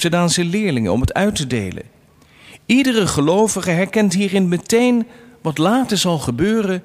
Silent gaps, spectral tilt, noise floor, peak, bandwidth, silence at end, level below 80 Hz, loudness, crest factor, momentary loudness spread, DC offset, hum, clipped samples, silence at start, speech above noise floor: none; -5 dB/octave; -48 dBFS; -2 dBFS; 16 kHz; 0.05 s; -40 dBFS; -17 LUFS; 14 dB; 8 LU; under 0.1%; none; under 0.1%; 0 s; 32 dB